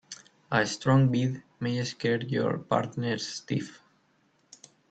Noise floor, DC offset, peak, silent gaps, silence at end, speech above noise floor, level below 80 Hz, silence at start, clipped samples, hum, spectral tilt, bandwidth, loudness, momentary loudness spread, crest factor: -68 dBFS; under 0.1%; -8 dBFS; none; 1.15 s; 40 dB; -66 dBFS; 0.1 s; under 0.1%; none; -6 dB/octave; 8.6 kHz; -28 LUFS; 11 LU; 22 dB